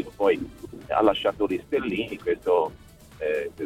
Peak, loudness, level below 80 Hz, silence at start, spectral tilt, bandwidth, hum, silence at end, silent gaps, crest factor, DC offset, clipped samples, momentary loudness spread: -6 dBFS; -26 LUFS; -52 dBFS; 0 s; -6 dB/octave; 15 kHz; none; 0 s; none; 20 dB; under 0.1%; under 0.1%; 9 LU